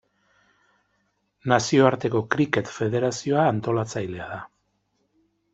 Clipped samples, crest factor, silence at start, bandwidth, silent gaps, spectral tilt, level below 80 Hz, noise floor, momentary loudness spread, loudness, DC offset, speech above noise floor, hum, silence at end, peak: under 0.1%; 22 dB; 1.45 s; 8.2 kHz; none; -5.5 dB/octave; -62 dBFS; -71 dBFS; 15 LU; -23 LUFS; under 0.1%; 49 dB; 50 Hz at -60 dBFS; 1.1 s; -2 dBFS